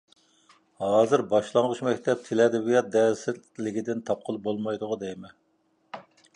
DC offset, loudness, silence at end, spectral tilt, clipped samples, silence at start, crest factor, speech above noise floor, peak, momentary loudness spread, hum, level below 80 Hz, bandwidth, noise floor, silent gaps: under 0.1%; -26 LUFS; 0.35 s; -5.5 dB/octave; under 0.1%; 0.8 s; 20 dB; 44 dB; -6 dBFS; 16 LU; none; -70 dBFS; 10.5 kHz; -69 dBFS; none